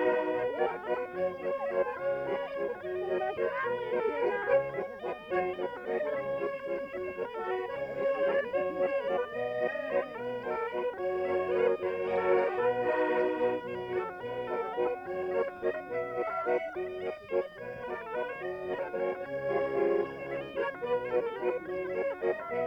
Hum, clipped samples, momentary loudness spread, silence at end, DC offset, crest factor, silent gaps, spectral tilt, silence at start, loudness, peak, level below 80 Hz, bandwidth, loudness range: none; under 0.1%; 8 LU; 0 s; under 0.1%; 16 dB; none; -7 dB/octave; 0 s; -32 LUFS; -16 dBFS; -68 dBFS; 6 kHz; 4 LU